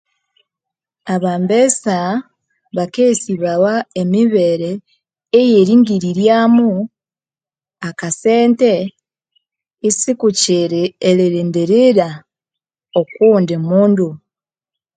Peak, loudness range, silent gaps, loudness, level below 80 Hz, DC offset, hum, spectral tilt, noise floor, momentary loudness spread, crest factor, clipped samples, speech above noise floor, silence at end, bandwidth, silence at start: 0 dBFS; 4 LU; none; -14 LUFS; -62 dBFS; under 0.1%; none; -5 dB/octave; under -90 dBFS; 12 LU; 14 dB; under 0.1%; over 77 dB; 0.8 s; 9.4 kHz; 1.05 s